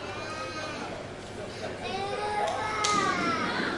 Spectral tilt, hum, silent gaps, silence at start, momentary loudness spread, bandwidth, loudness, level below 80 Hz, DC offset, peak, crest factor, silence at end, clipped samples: -3 dB/octave; none; none; 0 s; 13 LU; 11.5 kHz; -30 LUFS; -56 dBFS; under 0.1%; -10 dBFS; 20 dB; 0 s; under 0.1%